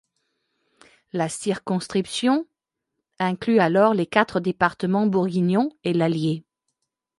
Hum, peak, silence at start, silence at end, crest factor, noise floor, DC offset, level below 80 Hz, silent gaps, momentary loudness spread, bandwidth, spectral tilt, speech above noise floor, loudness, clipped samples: none; -2 dBFS; 1.15 s; 0.8 s; 20 dB; -81 dBFS; under 0.1%; -62 dBFS; none; 8 LU; 11.5 kHz; -6 dB/octave; 60 dB; -22 LUFS; under 0.1%